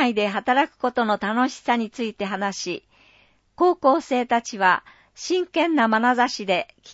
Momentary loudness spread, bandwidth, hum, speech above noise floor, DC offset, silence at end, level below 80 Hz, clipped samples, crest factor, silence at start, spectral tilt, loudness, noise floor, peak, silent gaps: 8 LU; 8 kHz; none; 36 dB; under 0.1%; 0 s; -66 dBFS; under 0.1%; 18 dB; 0 s; -4 dB/octave; -22 LUFS; -58 dBFS; -4 dBFS; none